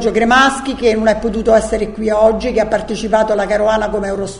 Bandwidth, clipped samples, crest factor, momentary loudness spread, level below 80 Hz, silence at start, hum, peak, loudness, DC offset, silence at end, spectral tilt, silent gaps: 11 kHz; under 0.1%; 14 dB; 7 LU; -34 dBFS; 0 s; none; 0 dBFS; -14 LUFS; under 0.1%; 0 s; -4.5 dB/octave; none